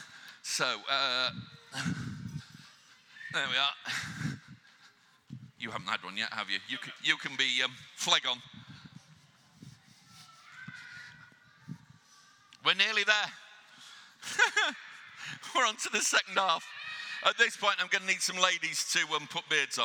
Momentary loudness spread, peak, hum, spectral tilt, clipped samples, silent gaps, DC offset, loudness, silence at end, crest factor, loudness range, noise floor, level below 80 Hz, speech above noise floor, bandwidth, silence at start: 23 LU; -8 dBFS; none; -1 dB/octave; under 0.1%; none; under 0.1%; -30 LUFS; 0 s; 26 dB; 9 LU; -62 dBFS; -74 dBFS; 31 dB; 19 kHz; 0 s